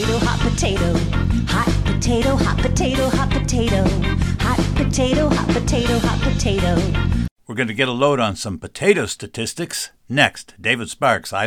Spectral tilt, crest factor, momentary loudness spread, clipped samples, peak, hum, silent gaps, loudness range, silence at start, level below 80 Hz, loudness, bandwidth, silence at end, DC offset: -5 dB/octave; 18 dB; 7 LU; under 0.1%; 0 dBFS; none; 7.31-7.36 s; 1 LU; 0 s; -26 dBFS; -19 LUFS; 16.5 kHz; 0 s; under 0.1%